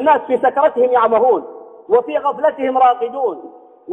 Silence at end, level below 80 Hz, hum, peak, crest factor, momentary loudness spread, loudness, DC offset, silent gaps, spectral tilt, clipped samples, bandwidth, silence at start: 0 s; -64 dBFS; none; -2 dBFS; 14 dB; 8 LU; -15 LUFS; under 0.1%; none; -6.5 dB/octave; under 0.1%; 3.9 kHz; 0 s